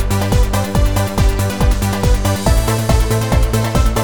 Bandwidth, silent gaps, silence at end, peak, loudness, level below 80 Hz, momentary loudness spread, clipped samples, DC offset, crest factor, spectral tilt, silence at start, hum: 19.5 kHz; none; 0 s; 0 dBFS; -16 LUFS; -16 dBFS; 1 LU; under 0.1%; under 0.1%; 14 dB; -5.5 dB/octave; 0 s; none